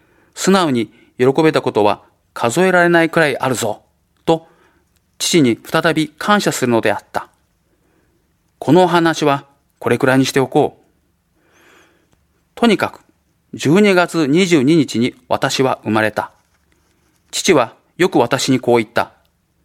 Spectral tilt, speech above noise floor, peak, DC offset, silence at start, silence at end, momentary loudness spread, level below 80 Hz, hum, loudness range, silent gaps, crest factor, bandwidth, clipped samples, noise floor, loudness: -5 dB/octave; 47 dB; 0 dBFS; under 0.1%; 0.35 s; 0.6 s; 11 LU; -56 dBFS; none; 4 LU; none; 16 dB; 16 kHz; under 0.1%; -61 dBFS; -15 LUFS